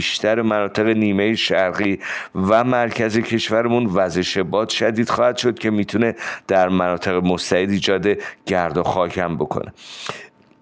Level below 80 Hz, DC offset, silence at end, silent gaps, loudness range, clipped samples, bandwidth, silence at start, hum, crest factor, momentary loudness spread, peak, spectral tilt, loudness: -52 dBFS; under 0.1%; 0.35 s; none; 2 LU; under 0.1%; 9.8 kHz; 0 s; none; 16 dB; 8 LU; -4 dBFS; -5 dB/octave; -19 LUFS